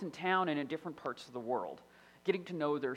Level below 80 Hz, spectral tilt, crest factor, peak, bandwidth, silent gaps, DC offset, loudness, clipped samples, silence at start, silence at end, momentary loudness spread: -80 dBFS; -6 dB/octave; 20 dB; -18 dBFS; 13.5 kHz; none; under 0.1%; -37 LUFS; under 0.1%; 0 s; 0 s; 11 LU